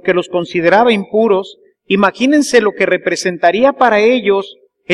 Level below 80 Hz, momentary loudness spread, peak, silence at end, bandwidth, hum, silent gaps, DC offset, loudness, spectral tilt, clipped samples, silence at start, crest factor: -56 dBFS; 7 LU; 0 dBFS; 0 s; 13 kHz; none; none; under 0.1%; -12 LUFS; -4.5 dB/octave; under 0.1%; 0.05 s; 12 dB